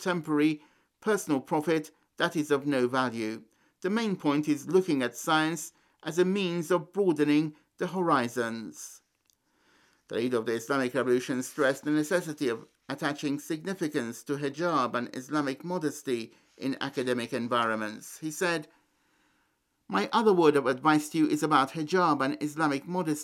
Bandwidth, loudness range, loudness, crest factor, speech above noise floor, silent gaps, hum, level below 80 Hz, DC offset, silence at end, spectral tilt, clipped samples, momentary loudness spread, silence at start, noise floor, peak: 16 kHz; 6 LU; -29 LUFS; 20 dB; 46 dB; none; none; -80 dBFS; under 0.1%; 0 s; -5 dB/octave; under 0.1%; 11 LU; 0 s; -74 dBFS; -8 dBFS